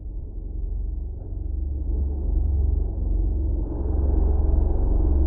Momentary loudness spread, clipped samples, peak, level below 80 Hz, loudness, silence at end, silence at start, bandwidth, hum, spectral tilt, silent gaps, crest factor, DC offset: 11 LU; under 0.1%; -10 dBFS; -22 dBFS; -27 LUFS; 0 s; 0 s; 1.6 kHz; none; -15 dB/octave; none; 12 dB; under 0.1%